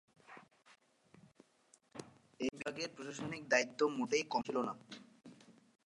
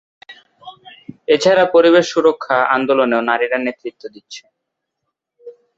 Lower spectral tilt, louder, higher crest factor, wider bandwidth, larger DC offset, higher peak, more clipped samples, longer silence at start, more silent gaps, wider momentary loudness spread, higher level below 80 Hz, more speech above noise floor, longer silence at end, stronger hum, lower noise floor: about the same, -3.5 dB/octave vs -4.5 dB/octave; second, -38 LUFS vs -14 LUFS; first, 26 dB vs 16 dB; first, 11.5 kHz vs 8 kHz; neither; second, -16 dBFS vs -2 dBFS; neither; about the same, 0.3 s vs 0.3 s; neither; about the same, 25 LU vs 23 LU; second, -80 dBFS vs -64 dBFS; second, 33 dB vs 62 dB; about the same, 0.35 s vs 0.25 s; neither; second, -71 dBFS vs -77 dBFS